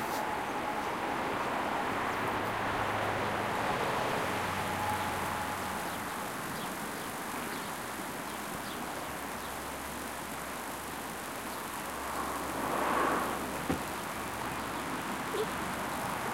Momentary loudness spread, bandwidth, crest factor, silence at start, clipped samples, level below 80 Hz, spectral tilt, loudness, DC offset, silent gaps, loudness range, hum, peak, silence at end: 7 LU; 17 kHz; 18 dB; 0 s; under 0.1%; -56 dBFS; -3.5 dB/octave; -35 LUFS; under 0.1%; none; 6 LU; none; -18 dBFS; 0 s